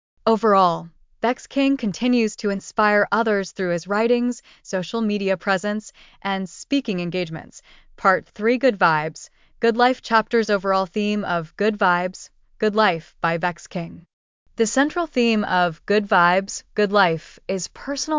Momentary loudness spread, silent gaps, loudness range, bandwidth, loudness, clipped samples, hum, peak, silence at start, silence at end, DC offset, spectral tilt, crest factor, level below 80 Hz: 11 LU; 14.13-14.46 s; 4 LU; 7.6 kHz; -21 LUFS; under 0.1%; none; -4 dBFS; 0.25 s; 0 s; under 0.1%; -4.5 dB/octave; 18 dB; -56 dBFS